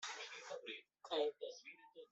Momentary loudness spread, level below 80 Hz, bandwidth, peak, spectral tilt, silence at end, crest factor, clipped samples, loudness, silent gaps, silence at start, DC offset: 16 LU; under -90 dBFS; 8.2 kHz; -28 dBFS; -0.5 dB/octave; 0.05 s; 18 dB; under 0.1%; -46 LUFS; none; 0 s; under 0.1%